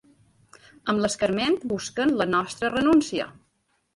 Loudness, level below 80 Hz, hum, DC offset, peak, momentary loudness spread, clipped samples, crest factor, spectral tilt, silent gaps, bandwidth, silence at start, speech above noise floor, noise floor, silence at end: -24 LUFS; -56 dBFS; none; under 0.1%; -10 dBFS; 10 LU; under 0.1%; 16 dB; -4.5 dB/octave; none; 11.5 kHz; 0.85 s; 47 dB; -71 dBFS; 0.65 s